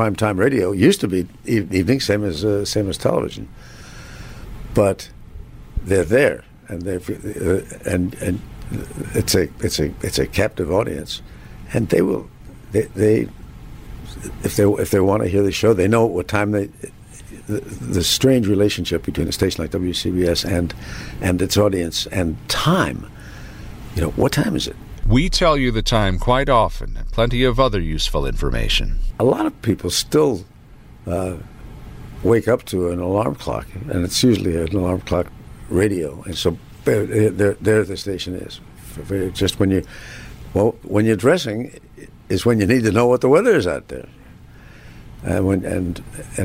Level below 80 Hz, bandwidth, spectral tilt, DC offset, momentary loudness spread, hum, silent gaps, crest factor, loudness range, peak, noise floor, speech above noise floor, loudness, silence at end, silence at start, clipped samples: -32 dBFS; 16 kHz; -5.5 dB/octave; under 0.1%; 19 LU; none; none; 16 dB; 4 LU; -2 dBFS; -42 dBFS; 24 dB; -19 LUFS; 0 s; 0 s; under 0.1%